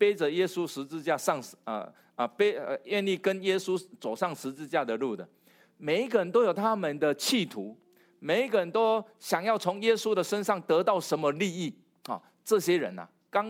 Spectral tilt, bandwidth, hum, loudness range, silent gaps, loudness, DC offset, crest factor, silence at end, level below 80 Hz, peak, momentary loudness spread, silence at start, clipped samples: -4.5 dB/octave; 16.5 kHz; none; 3 LU; none; -29 LUFS; under 0.1%; 18 dB; 0 s; -86 dBFS; -12 dBFS; 12 LU; 0 s; under 0.1%